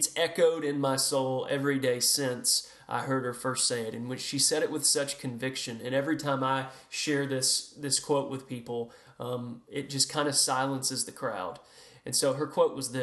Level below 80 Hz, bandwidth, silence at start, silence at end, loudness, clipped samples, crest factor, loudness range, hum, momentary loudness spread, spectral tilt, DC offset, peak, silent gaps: -74 dBFS; 13 kHz; 0 s; 0 s; -29 LUFS; under 0.1%; 20 dB; 3 LU; none; 12 LU; -2.5 dB/octave; under 0.1%; -10 dBFS; none